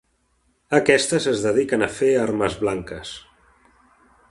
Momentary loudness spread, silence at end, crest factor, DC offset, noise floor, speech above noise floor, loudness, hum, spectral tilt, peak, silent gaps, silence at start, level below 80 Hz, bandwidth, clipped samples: 16 LU; 1.1 s; 22 dB; under 0.1%; -66 dBFS; 46 dB; -20 LUFS; none; -4 dB/octave; 0 dBFS; none; 0.7 s; -52 dBFS; 11.5 kHz; under 0.1%